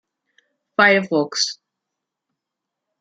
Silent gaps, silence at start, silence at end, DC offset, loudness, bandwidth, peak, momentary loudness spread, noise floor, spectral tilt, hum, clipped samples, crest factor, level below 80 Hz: none; 0.8 s; 1.5 s; under 0.1%; -18 LUFS; 9.4 kHz; -2 dBFS; 12 LU; -83 dBFS; -3 dB/octave; none; under 0.1%; 22 dB; -72 dBFS